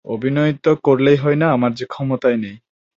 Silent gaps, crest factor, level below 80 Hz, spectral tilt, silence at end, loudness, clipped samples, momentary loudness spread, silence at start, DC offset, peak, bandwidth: none; 16 dB; -56 dBFS; -8.5 dB/octave; 0.4 s; -17 LUFS; under 0.1%; 9 LU; 0.05 s; under 0.1%; -2 dBFS; 7.4 kHz